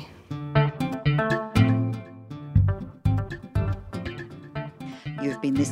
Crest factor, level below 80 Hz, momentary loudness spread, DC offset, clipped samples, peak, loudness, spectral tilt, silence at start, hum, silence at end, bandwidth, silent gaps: 18 dB; -40 dBFS; 15 LU; under 0.1%; under 0.1%; -6 dBFS; -26 LUFS; -7 dB/octave; 0 s; none; 0 s; 11 kHz; none